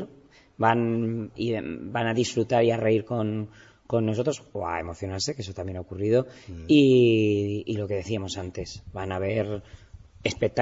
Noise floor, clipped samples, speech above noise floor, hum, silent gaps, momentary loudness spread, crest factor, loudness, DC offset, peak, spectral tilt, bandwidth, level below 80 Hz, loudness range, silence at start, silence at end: -54 dBFS; under 0.1%; 28 dB; none; none; 15 LU; 18 dB; -26 LUFS; under 0.1%; -6 dBFS; -6 dB/octave; 8 kHz; -54 dBFS; 5 LU; 0 s; 0 s